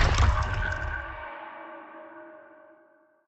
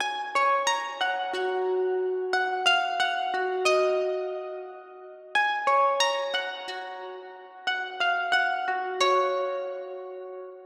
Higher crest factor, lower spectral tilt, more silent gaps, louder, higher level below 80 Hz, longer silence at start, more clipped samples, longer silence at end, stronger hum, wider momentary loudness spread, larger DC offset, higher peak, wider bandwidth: about the same, 20 dB vs 18 dB; first, -5 dB/octave vs 0 dB/octave; neither; second, -29 LUFS vs -26 LUFS; first, -32 dBFS vs -82 dBFS; about the same, 0 s vs 0 s; neither; first, 0.85 s vs 0 s; neither; first, 22 LU vs 16 LU; neither; about the same, -10 dBFS vs -8 dBFS; second, 8.2 kHz vs 14 kHz